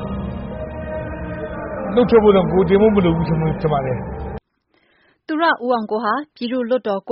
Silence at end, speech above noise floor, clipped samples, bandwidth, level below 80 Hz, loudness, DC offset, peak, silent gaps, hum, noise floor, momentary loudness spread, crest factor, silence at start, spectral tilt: 0 s; 47 dB; under 0.1%; 5.6 kHz; -36 dBFS; -19 LUFS; under 0.1%; -4 dBFS; none; none; -63 dBFS; 15 LU; 16 dB; 0 s; -6 dB/octave